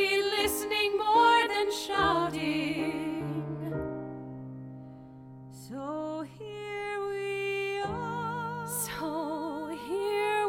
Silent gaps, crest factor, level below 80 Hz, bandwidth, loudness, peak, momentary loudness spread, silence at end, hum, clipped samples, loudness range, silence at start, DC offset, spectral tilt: none; 18 dB; -58 dBFS; 17 kHz; -30 LUFS; -12 dBFS; 18 LU; 0 s; none; under 0.1%; 12 LU; 0 s; under 0.1%; -4 dB/octave